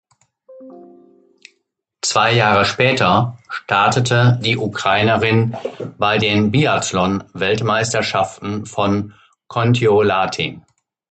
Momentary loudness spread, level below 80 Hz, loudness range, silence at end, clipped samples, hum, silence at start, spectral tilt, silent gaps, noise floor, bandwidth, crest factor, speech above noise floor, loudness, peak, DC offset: 10 LU; -48 dBFS; 3 LU; 0.55 s; under 0.1%; none; 0.5 s; -5 dB/octave; none; -70 dBFS; 9 kHz; 18 dB; 54 dB; -16 LUFS; 0 dBFS; under 0.1%